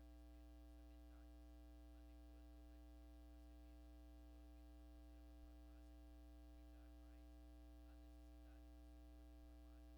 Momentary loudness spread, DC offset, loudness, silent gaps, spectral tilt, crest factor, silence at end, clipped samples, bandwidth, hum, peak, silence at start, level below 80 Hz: 0 LU; under 0.1%; -65 LUFS; none; -7 dB/octave; 8 dB; 0 s; under 0.1%; 19 kHz; 60 Hz at -65 dBFS; -54 dBFS; 0 s; -62 dBFS